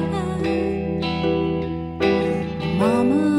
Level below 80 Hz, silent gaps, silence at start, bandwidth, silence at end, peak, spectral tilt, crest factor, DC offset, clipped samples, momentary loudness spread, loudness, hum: -42 dBFS; none; 0 s; 11.5 kHz; 0 s; -6 dBFS; -7.5 dB/octave; 16 dB; under 0.1%; under 0.1%; 6 LU; -22 LUFS; none